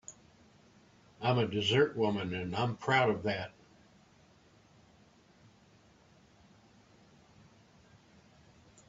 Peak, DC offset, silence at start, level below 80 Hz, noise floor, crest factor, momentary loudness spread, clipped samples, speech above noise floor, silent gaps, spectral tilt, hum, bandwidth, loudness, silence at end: -12 dBFS; under 0.1%; 0.1 s; -70 dBFS; -63 dBFS; 24 dB; 9 LU; under 0.1%; 32 dB; none; -5.5 dB/octave; none; 7.8 kHz; -31 LUFS; 5.4 s